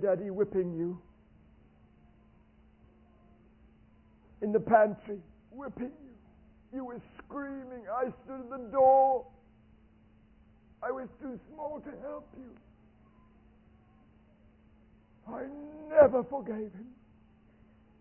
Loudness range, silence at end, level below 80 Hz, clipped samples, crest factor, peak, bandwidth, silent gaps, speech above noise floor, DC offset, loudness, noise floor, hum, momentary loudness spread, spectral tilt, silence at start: 16 LU; 1.1 s; -64 dBFS; under 0.1%; 24 dB; -10 dBFS; 3 kHz; none; 31 dB; under 0.1%; -31 LUFS; -62 dBFS; none; 22 LU; -2 dB/octave; 0 s